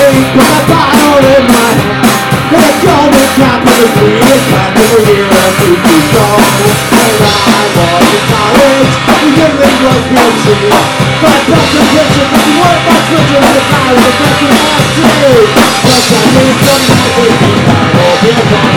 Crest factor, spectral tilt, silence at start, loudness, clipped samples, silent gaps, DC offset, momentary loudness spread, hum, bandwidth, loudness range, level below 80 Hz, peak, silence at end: 6 dB; -4.5 dB/octave; 0 s; -6 LUFS; 5%; none; under 0.1%; 2 LU; none; over 20 kHz; 1 LU; -32 dBFS; 0 dBFS; 0 s